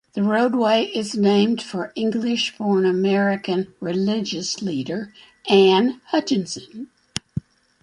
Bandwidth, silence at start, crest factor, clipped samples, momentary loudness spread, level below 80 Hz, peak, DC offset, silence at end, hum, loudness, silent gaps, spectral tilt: 11.5 kHz; 0.15 s; 20 dB; under 0.1%; 15 LU; -58 dBFS; -2 dBFS; under 0.1%; 0.45 s; none; -21 LUFS; none; -5 dB/octave